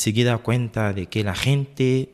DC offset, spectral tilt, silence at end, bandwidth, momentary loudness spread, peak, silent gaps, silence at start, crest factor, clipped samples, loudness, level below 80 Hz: under 0.1%; -5.5 dB/octave; 0.1 s; 14.5 kHz; 5 LU; -6 dBFS; none; 0 s; 16 dB; under 0.1%; -22 LUFS; -48 dBFS